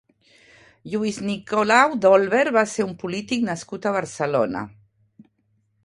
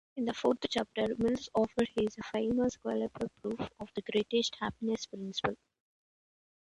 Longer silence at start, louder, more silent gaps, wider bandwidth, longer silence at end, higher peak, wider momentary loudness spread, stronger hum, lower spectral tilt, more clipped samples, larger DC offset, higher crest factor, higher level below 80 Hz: first, 0.85 s vs 0.15 s; first, -21 LUFS vs -34 LUFS; neither; about the same, 11.5 kHz vs 11.5 kHz; about the same, 1.15 s vs 1.15 s; first, 0 dBFS vs -14 dBFS; first, 12 LU vs 8 LU; neither; about the same, -4.5 dB/octave vs -5 dB/octave; neither; neither; about the same, 22 dB vs 20 dB; about the same, -62 dBFS vs -62 dBFS